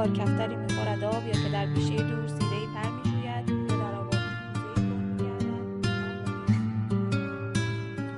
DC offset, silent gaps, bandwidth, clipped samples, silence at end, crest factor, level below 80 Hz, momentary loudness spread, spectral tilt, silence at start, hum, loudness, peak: under 0.1%; none; 11.5 kHz; under 0.1%; 0 s; 16 dB; -52 dBFS; 4 LU; -6.5 dB/octave; 0 s; none; -29 LUFS; -12 dBFS